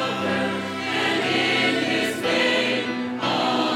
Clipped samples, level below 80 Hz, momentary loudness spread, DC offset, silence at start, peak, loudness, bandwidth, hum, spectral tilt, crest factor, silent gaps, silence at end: under 0.1%; -74 dBFS; 6 LU; under 0.1%; 0 s; -8 dBFS; -22 LUFS; 17 kHz; none; -4 dB/octave; 16 dB; none; 0 s